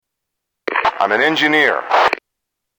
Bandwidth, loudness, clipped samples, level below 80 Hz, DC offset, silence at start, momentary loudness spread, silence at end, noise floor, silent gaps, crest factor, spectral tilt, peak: over 20 kHz; -15 LUFS; under 0.1%; -60 dBFS; under 0.1%; 0.65 s; 10 LU; 0.65 s; -79 dBFS; none; 16 dB; -3.5 dB/octave; -2 dBFS